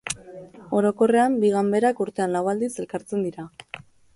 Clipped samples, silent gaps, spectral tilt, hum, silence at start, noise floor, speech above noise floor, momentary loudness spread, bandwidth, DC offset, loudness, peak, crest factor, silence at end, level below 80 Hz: under 0.1%; none; -5.5 dB/octave; none; 0.05 s; -43 dBFS; 21 dB; 21 LU; 11.5 kHz; under 0.1%; -23 LUFS; -8 dBFS; 16 dB; 0.4 s; -62 dBFS